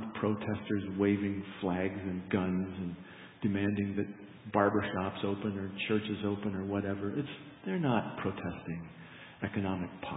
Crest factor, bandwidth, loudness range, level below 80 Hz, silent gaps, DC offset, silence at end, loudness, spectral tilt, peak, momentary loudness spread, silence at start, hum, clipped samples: 22 dB; 3.9 kHz; 3 LU; -58 dBFS; none; under 0.1%; 0 s; -34 LUFS; -5 dB/octave; -12 dBFS; 12 LU; 0 s; none; under 0.1%